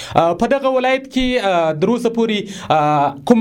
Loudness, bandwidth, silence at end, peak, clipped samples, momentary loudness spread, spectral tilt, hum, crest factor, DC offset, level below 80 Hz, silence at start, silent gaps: -16 LUFS; 15.5 kHz; 0 s; 0 dBFS; under 0.1%; 3 LU; -5.5 dB/octave; none; 16 dB; under 0.1%; -42 dBFS; 0 s; none